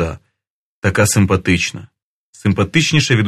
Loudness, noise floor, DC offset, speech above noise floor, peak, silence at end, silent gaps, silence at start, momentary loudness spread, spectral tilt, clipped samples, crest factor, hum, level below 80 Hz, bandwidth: -15 LUFS; -49 dBFS; under 0.1%; 34 dB; 0 dBFS; 0 s; 0.47-0.82 s, 2.02-2.33 s; 0 s; 10 LU; -4.5 dB/octave; under 0.1%; 16 dB; none; -40 dBFS; 13.5 kHz